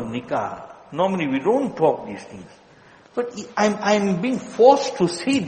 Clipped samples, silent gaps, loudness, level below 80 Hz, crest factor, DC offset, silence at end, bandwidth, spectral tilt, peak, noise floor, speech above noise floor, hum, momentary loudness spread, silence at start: under 0.1%; none; -21 LUFS; -62 dBFS; 20 dB; under 0.1%; 0 s; 8.8 kHz; -5.5 dB/octave; 0 dBFS; -50 dBFS; 29 dB; none; 17 LU; 0 s